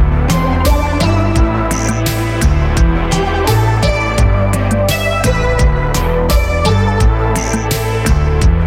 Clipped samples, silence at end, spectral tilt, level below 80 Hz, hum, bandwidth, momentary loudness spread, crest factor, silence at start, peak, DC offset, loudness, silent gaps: under 0.1%; 0 s; -5.5 dB/octave; -16 dBFS; none; 16.5 kHz; 3 LU; 10 dB; 0 s; -2 dBFS; under 0.1%; -14 LUFS; none